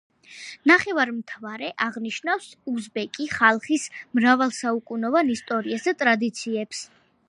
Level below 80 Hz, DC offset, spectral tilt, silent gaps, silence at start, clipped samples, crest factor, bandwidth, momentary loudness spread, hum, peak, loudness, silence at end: -68 dBFS; under 0.1%; -3.5 dB/octave; none; 0.3 s; under 0.1%; 22 dB; 11.5 kHz; 14 LU; none; -2 dBFS; -23 LUFS; 0.45 s